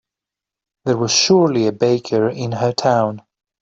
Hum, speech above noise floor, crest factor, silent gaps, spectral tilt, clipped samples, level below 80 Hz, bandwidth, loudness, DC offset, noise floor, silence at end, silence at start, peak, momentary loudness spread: none; 70 dB; 16 dB; none; -4.5 dB/octave; under 0.1%; -58 dBFS; 7.8 kHz; -17 LUFS; under 0.1%; -86 dBFS; 0.45 s; 0.85 s; -2 dBFS; 9 LU